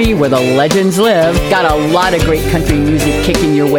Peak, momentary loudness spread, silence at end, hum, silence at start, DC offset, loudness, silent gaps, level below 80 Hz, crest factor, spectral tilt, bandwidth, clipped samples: 0 dBFS; 2 LU; 0 s; none; 0 s; under 0.1%; -11 LUFS; none; -24 dBFS; 10 dB; -5.5 dB/octave; 19.5 kHz; under 0.1%